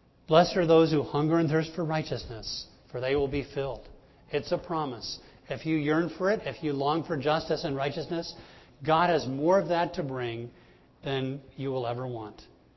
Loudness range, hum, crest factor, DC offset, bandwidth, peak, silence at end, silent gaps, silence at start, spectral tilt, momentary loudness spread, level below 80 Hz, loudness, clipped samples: 5 LU; none; 22 dB; under 0.1%; 6.2 kHz; -6 dBFS; 0.3 s; none; 0.3 s; -6.5 dB/octave; 15 LU; -54 dBFS; -28 LUFS; under 0.1%